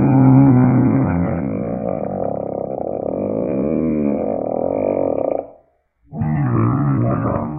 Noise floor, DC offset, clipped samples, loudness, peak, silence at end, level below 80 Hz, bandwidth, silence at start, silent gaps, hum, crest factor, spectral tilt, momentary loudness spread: -57 dBFS; under 0.1%; under 0.1%; -18 LUFS; 0 dBFS; 0 s; -42 dBFS; 2.7 kHz; 0 s; none; none; 16 dB; -16 dB/octave; 12 LU